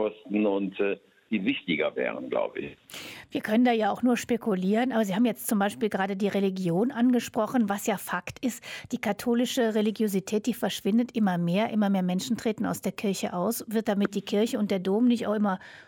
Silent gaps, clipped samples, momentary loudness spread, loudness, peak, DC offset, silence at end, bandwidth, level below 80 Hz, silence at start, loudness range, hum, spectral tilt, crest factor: none; under 0.1%; 8 LU; -27 LUFS; -12 dBFS; under 0.1%; 0.05 s; 17.5 kHz; -68 dBFS; 0 s; 2 LU; none; -5.5 dB/octave; 14 dB